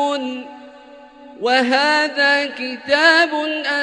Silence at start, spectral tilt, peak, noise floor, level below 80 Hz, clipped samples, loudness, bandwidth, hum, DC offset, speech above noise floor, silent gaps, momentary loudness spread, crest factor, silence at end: 0 s; -1.5 dB/octave; 0 dBFS; -42 dBFS; -68 dBFS; under 0.1%; -16 LUFS; 11 kHz; none; under 0.1%; 25 dB; none; 14 LU; 18 dB; 0 s